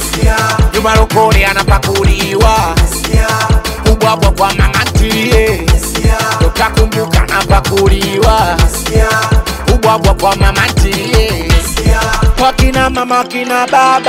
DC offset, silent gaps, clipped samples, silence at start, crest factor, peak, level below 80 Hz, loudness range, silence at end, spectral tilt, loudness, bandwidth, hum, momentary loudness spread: under 0.1%; none; under 0.1%; 0 s; 10 dB; 0 dBFS; -14 dBFS; 1 LU; 0 s; -4.5 dB/octave; -10 LUFS; 16.5 kHz; none; 3 LU